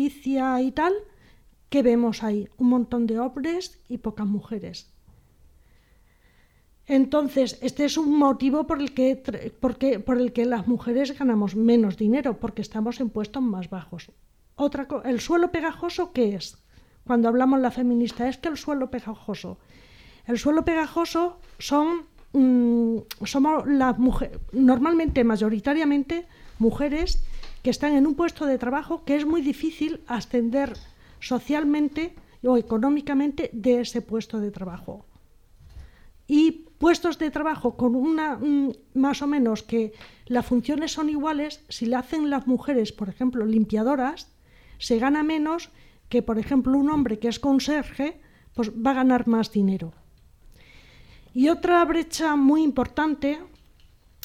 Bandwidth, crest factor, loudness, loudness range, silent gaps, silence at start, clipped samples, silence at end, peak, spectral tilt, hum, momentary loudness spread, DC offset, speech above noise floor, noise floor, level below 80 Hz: 14.5 kHz; 16 dB; -24 LUFS; 5 LU; none; 0 s; under 0.1%; 0.8 s; -8 dBFS; -6 dB/octave; none; 12 LU; under 0.1%; 35 dB; -58 dBFS; -44 dBFS